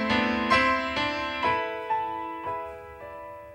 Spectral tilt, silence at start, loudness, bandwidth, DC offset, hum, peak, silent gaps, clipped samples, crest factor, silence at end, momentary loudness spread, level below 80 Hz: -4.5 dB/octave; 0 s; -26 LUFS; 16 kHz; under 0.1%; none; -8 dBFS; none; under 0.1%; 20 dB; 0 s; 19 LU; -52 dBFS